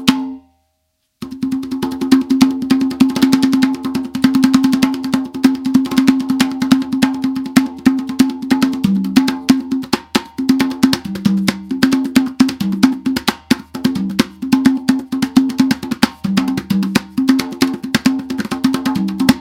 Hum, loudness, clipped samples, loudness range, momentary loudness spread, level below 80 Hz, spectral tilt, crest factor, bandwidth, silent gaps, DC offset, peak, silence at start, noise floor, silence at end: none; -16 LUFS; 0.2%; 2 LU; 6 LU; -48 dBFS; -5 dB/octave; 16 dB; 16.5 kHz; none; under 0.1%; 0 dBFS; 0 s; -67 dBFS; 0 s